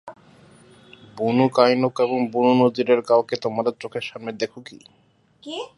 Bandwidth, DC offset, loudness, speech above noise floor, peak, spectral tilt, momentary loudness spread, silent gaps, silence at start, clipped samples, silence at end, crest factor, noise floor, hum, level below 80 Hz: 11.5 kHz; under 0.1%; -21 LUFS; 30 dB; -2 dBFS; -6.5 dB/octave; 13 LU; none; 0.05 s; under 0.1%; 0.1 s; 20 dB; -51 dBFS; none; -70 dBFS